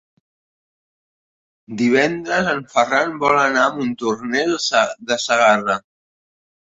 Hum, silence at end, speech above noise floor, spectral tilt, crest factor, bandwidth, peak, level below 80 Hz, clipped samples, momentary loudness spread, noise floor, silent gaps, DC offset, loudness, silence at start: none; 0.95 s; over 72 dB; -3.5 dB/octave; 18 dB; 8.2 kHz; -2 dBFS; -60 dBFS; under 0.1%; 8 LU; under -90 dBFS; none; under 0.1%; -18 LUFS; 1.7 s